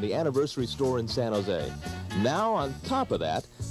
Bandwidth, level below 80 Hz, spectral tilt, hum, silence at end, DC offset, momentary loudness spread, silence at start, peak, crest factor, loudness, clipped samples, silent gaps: 14 kHz; -50 dBFS; -6 dB/octave; none; 0 s; under 0.1%; 6 LU; 0 s; -14 dBFS; 14 dB; -29 LUFS; under 0.1%; none